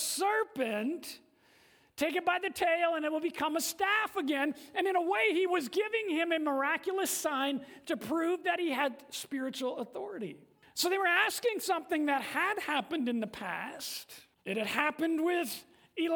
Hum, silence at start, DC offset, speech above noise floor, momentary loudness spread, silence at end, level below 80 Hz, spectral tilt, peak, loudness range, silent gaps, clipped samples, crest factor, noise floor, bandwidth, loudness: none; 0 s; under 0.1%; 32 dB; 12 LU; 0 s; -78 dBFS; -2.5 dB/octave; -12 dBFS; 3 LU; none; under 0.1%; 20 dB; -64 dBFS; over 20 kHz; -32 LUFS